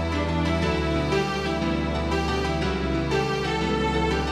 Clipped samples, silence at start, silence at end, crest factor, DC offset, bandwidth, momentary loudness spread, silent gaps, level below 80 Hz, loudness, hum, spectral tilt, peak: under 0.1%; 0 s; 0 s; 14 dB; under 0.1%; 12.5 kHz; 2 LU; none; -34 dBFS; -25 LUFS; none; -6 dB/octave; -10 dBFS